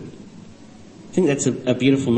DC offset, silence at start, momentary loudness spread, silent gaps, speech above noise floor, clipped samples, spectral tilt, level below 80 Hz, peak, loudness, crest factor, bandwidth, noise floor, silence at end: 0.2%; 0 s; 23 LU; none; 25 dB; under 0.1%; -5.5 dB/octave; -56 dBFS; -4 dBFS; -20 LUFS; 16 dB; 8.8 kHz; -43 dBFS; 0 s